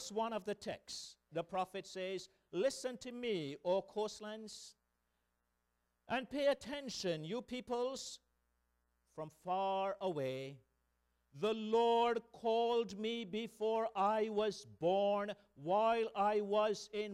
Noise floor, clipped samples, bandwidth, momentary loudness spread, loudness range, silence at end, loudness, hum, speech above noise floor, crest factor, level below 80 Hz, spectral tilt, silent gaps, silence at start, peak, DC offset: -84 dBFS; under 0.1%; 13.5 kHz; 13 LU; 7 LU; 0 s; -38 LUFS; 60 Hz at -75 dBFS; 46 dB; 16 dB; -76 dBFS; -4.5 dB/octave; none; 0 s; -22 dBFS; under 0.1%